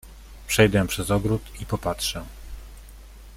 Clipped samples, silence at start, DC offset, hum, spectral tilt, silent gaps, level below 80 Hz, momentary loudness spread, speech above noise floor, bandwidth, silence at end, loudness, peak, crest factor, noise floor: under 0.1%; 0.05 s; under 0.1%; none; -4.5 dB/octave; none; -40 dBFS; 24 LU; 20 dB; 16.5 kHz; 0 s; -24 LUFS; -4 dBFS; 22 dB; -43 dBFS